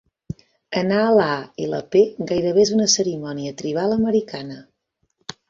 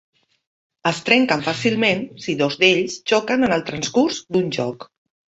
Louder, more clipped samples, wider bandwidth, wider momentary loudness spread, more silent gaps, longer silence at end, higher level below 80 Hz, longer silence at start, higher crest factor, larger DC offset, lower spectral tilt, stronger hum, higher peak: about the same, -20 LUFS vs -19 LUFS; neither; about the same, 7.8 kHz vs 8.2 kHz; first, 20 LU vs 9 LU; neither; first, 0.9 s vs 0.55 s; about the same, -56 dBFS vs -58 dBFS; second, 0.7 s vs 0.85 s; about the same, 18 dB vs 20 dB; neither; about the same, -4 dB/octave vs -4 dB/octave; neither; second, -4 dBFS vs 0 dBFS